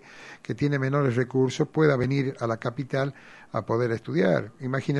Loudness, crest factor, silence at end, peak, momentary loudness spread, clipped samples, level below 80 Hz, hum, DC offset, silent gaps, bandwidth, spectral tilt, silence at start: -26 LUFS; 18 dB; 0 s; -6 dBFS; 10 LU; under 0.1%; -60 dBFS; none; under 0.1%; none; 10.5 kHz; -7.5 dB/octave; 0.1 s